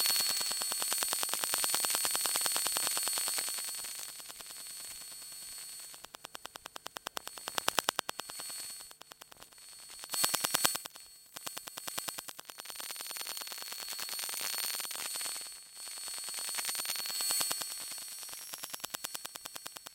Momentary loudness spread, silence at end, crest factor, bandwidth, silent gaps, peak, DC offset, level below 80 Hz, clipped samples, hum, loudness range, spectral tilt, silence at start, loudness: 17 LU; 0 s; 36 dB; 17 kHz; none; -2 dBFS; under 0.1%; -78 dBFS; under 0.1%; none; 10 LU; 1.5 dB/octave; 0 s; -34 LUFS